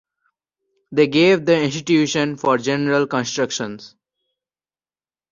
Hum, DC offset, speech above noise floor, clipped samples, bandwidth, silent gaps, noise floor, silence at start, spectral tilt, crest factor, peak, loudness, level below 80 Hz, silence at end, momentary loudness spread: none; under 0.1%; over 72 dB; under 0.1%; 7.4 kHz; none; under -90 dBFS; 0.9 s; -4.5 dB/octave; 18 dB; -2 dBFS; -18 LUFS; -62 dBFS; 1.45 s; 10 LU